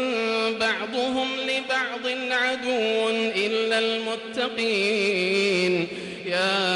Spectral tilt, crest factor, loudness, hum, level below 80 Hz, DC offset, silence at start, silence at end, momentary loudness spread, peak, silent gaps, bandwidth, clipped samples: -3.5 dB/octave; 12 dB; -24 LUFS; none; -68 dBFS; under 0.1%; 0 s; 0 s; 6 LU; -12 dBFS; none; 11.5 kHz; under 0.1%